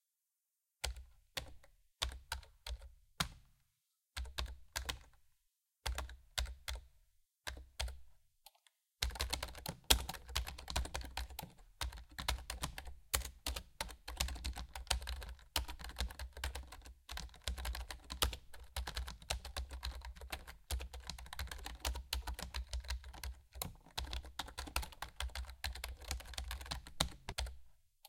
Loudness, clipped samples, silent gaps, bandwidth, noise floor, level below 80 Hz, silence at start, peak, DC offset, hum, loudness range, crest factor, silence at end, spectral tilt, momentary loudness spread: -44 LUFS; under 0.1%; none; 17 kHz; -89 dBFS; -48 dBFS; 0.85 s; -6 dBFS; under 0.1%; none; 7 LU; 40 dB; 0 s; -2 dB/octave; 10 LU